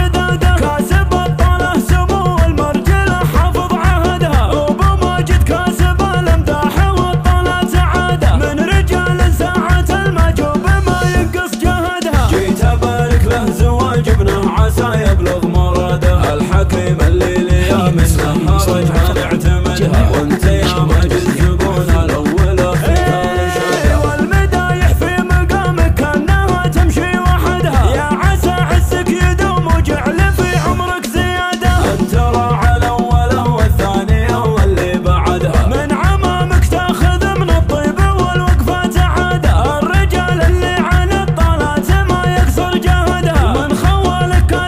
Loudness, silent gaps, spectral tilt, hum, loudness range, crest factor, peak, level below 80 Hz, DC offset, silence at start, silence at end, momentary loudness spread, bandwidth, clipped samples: -13 LUFS; none; -6 dB/octave; none; 1 LU; 12 dB; 0 dBFS; -16 dBFS; under 0.1%; 0 s; 0 s; 2 LU; 16 kHz; under 0.1%